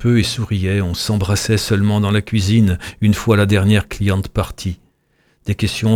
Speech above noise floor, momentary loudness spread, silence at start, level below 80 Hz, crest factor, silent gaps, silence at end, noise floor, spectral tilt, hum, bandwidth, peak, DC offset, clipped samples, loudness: 44 dB; 9 LU; 0 s; -36 dBFS; 14 dB; none; 0 s; -60 dBFS; -6 dB/octave; none; 16 kHz; -2 dBFS; under 0.1%; under 0.1%; -17 LUFS